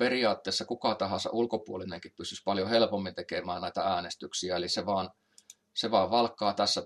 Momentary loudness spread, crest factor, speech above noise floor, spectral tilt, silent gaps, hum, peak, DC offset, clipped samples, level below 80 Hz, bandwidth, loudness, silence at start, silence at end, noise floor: 11 LU; 20 dB; 28 dB; -3.5 dB/octave; none; none; -10 dBFS; under 0.1%; under 0.1%; -72 dBFS; 12.5 kHz; -31 LUFS; 0 s; 0 s; -58 dBFS